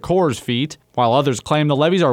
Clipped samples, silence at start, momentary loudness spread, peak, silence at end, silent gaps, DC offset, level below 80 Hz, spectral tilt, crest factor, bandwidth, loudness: under 0.1%; 0.05 s; 6 LU; -2 dBFS; 0 s; none; under 0.1%; -50 dBFS; -6 dB/octave; 14 dB; 15 kHz; -18 LUFS